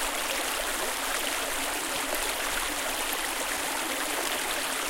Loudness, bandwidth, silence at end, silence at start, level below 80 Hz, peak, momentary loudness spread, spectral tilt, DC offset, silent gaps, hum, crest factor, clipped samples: -28 LUFS; 17 kHz; 0 s; 0 s; -48 dBFS; -12 dBFS; 1 LU; 0 dB/octave; under 0.1%; none; none; 18 dB; under 0.1%